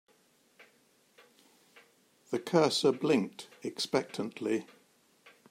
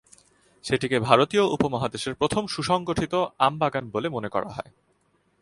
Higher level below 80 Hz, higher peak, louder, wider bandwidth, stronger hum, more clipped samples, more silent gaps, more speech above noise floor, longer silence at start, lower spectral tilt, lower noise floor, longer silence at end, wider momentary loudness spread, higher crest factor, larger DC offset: second, -80 dBFS vs -54 dBFS; second, -12 dBFS vs -2 dBFS; second, -31 LUFS vs -24 LUFS; first, 16 kHz vs 11.5 kHz; neither; neither; neither; second, 37 dB vs 43 dB; first, 2.3 s vs 0.65 s; about the same, -4.5 dB/octave vs -5 dB/octave; about the same, -68 dBFS vs -67 dBFS; about the same, 0.9 s vs 0.8 s; first, 13 LU vs 10 LU; about the same, 22 dB vs 24 dB; neither